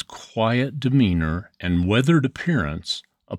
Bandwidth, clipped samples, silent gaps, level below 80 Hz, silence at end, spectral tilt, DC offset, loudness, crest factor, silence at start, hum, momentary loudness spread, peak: 11.5 kHz; under 0.1%; none; -40 dBFS; 0 s; -6.5 dB/octave; under 0.1%; -22 LUFS; 16 dB; 0.1 s; none; 10 LU; -6 dBFS